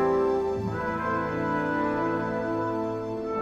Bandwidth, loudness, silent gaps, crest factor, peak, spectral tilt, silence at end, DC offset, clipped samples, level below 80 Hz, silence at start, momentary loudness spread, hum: 8.4 kHz; -28 LUFS; none; 12 dB; -14 dBFS; -8 dB/octave; 0 s; under 0.1%; under 0.1%; -52 dBFS; 0 s; 5 LU; none